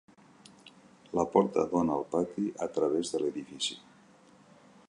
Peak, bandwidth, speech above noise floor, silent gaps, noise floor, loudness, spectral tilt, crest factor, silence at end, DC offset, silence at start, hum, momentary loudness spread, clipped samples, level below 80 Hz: -10 dBFS; 11.5 kHz; 29 dB; none; -59 dBFS; -31 LUFS; -5 dB/octave; 22 dB; 1.1 s; under 0.1%; 0.65 s; none; 8 LU; under 0.1%; -66 dBFS